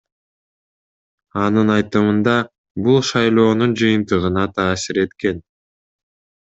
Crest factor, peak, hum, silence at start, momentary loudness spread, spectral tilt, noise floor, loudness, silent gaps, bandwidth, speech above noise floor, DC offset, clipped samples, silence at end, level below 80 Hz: 16 dB; -2 dBFS; none; 1.35 s; 8 LU; -6 dB/octave; under -90 dBFS; -17 LUFS; 2.58-2.64 s, 2.71-2.75 s; 8 kHz; over 74 dB; under 0.1%; under 0.1%; 1.1 s; -56 dBFS